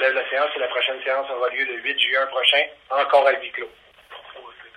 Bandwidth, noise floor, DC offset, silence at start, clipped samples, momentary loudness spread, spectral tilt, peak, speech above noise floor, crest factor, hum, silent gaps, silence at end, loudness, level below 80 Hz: 10 kHz; -43 dBFS; under 0.1%; 0 s; under 0.1%; 20 LU; -1 dB/octave; -2 dBFS; 21 dB; 20 dB; none; none; 0.1 s; -20 LUFS; -70 dBFS